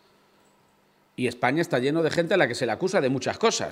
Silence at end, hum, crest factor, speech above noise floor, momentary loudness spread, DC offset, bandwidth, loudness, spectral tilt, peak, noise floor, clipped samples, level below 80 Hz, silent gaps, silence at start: 0 s; none; 20 dB; 39 dB; 6 LU; under 0.1%; 15.5 kHz; -24 LUFS; -4.5 dB/octave; -6 dBFS; -63 dBFS; under 0.1%; -68 dBFS; none; 1.2 s